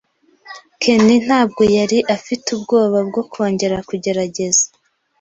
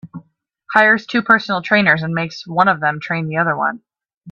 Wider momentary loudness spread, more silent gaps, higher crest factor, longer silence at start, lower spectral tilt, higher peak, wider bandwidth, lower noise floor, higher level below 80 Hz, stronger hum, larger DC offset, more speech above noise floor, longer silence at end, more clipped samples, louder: about the same, 9 LU vs 9 LU; second, none vs 4.17-4.21 s; about the same, 16 dB vs 18 dB; first, 0.45 s vs 0.05 s; second, -4 dB/octave vs -6.5 dB/octave; about the same, -2 dBFS vs 0 dBFS; first, 8.2 kHz vs 7.4 kHz; second, -42 dBFS vs -53 dBFS; first, -52 dBFS vs -60 dBFS; neither; neither; second, 26 dB vs 37 dB; first, 0.55 s vs 0 s; neither; about the same, -16 LUFS vs -16 LUFS